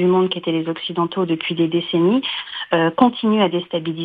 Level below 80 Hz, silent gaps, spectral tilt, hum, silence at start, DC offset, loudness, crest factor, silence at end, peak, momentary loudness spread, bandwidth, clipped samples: -64 dBFS; none; -9 dB/octave; none; 0 s; under 0.1%; -19 LUFS; 18 dB; 0 s; 0 dBFS; 7 LU; 5 kHz; under 0.1%